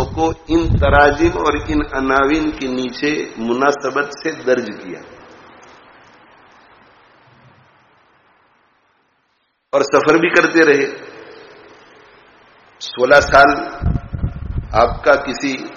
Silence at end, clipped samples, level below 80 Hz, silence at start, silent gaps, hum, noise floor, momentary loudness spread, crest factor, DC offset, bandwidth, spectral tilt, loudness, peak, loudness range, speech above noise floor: 0 s; under 0.1%; -32 dBFS; 0 s; none; none; -65 dBFS; 15 LU; 18 dB; under 0.1%; 7.4 kHz; -4 dB/octave; -15 LUFS; 0 dBFS; 9 LU; 50 dB